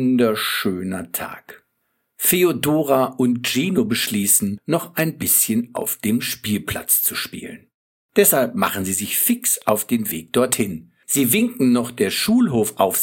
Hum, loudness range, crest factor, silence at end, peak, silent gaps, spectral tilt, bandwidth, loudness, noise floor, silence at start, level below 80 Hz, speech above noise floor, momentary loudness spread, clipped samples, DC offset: none; 2 LU; 20 dB; 0 s; 0 dBFS; 7.74-8.09 s; -3.5 dB/octave; 17 kHz; -19 LUFS; -71 dBFS; 0 s; -56 dBFS; 52 dB; 10 LU; under 0.1%; under 0.1%